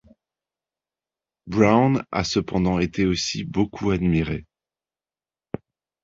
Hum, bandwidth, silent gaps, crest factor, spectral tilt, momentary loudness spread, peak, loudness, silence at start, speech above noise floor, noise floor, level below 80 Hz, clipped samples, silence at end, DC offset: none; 7.8 kHz; none; 22 dB; -6 dB/octave; 17 LU; -2 dBFS; -22 LUFS; 1.45 s; over 69 dB; under -90 dBFS; -44 dBFS; under 0.1%; 1.6 s; under 0.1%